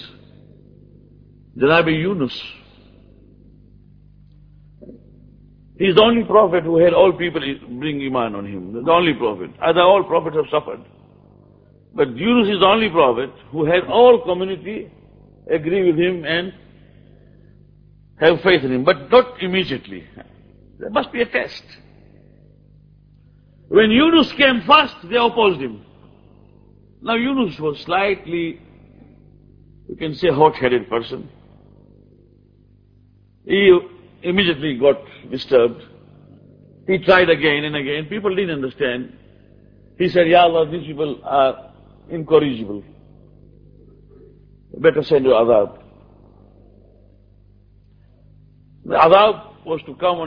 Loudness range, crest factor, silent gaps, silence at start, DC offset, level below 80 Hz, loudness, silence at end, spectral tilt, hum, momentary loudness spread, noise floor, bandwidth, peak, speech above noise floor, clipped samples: 7 LU; 20 dB; none; 0 s; under 0.1%; -50 dBFS; -17 LUFS; 0 s; -7.5 dB/octave; 50 Hz at -50 dBFS; 17 LU; -52 dBFS; 5.4 kHz; 0 dBFS; 36 dB; under 0.1%